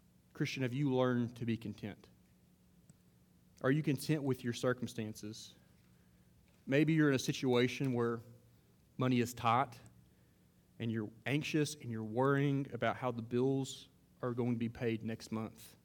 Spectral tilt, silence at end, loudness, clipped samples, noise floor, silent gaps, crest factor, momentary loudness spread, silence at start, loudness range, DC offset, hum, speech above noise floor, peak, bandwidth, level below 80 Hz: -6 dB/octave; 0.15 s; -36 LUFS; under 0.1%; -68 dBFS; none; 20 dB; 13 LU; 0.35 s; 4 LU; under 0.1%; none; 32 dB; -18 dBFS; 19 kHz; -72 dBFS